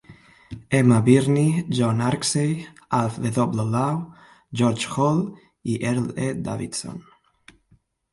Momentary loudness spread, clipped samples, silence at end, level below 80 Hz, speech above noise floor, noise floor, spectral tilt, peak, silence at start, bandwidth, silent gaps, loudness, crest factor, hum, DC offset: 16 LU; under 0.1%; 1.15 s; -56 dBFS; 40 dB; -61 dBFS; -6 dB/octave; -2 dBFS; 0.1 s; 11.5 kHz; none; -22 LUFS; 20 dB; none; under 0.1%